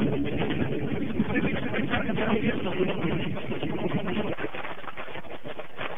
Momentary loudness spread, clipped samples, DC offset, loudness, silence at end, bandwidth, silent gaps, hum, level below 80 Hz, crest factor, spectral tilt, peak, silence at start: 12 LU; under 0.1%; 3%; -29 LUFS; 0 s; 3.9 kHz; none; none; -48 dBFS; 16 dB; -8.5 dB/octave; -12 dBFS; 0 s